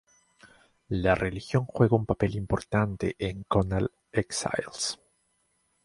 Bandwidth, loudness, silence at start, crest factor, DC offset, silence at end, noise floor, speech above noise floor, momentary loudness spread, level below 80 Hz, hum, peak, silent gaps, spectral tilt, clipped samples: 11.5 kHz; -28 LUFS; 0.45 s; 20 dB; under 0.1%; 0.9 s; -72 dBFS; 45 dB; 8 LU; -46 dBFS; none; -8 dBFS; none; -5.5 dB/octave; under 0.1%